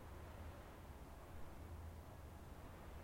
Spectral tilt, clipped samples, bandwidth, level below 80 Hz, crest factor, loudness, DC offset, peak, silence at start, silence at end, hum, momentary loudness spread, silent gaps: -6 dB/octave; under 0.1%; 16.5 kHz; -60 dBFS; 12 dB; -57 LUFS; under 0.1%; -42 dBFS; 0 s; 0 s; none; 2 LU; none